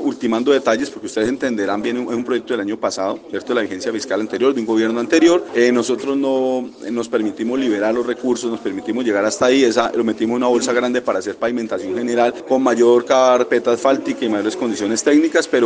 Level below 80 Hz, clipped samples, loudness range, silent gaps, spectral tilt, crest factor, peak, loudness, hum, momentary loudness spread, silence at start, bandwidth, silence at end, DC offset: -62 dBFS; under 0.1%; 4 LU; none; -4 dB/octave; 16 dB; 0 dBFS; -18 LUFS; none; 8 LU; 0 s; 9.8 kHz; 0 s; under 0.1%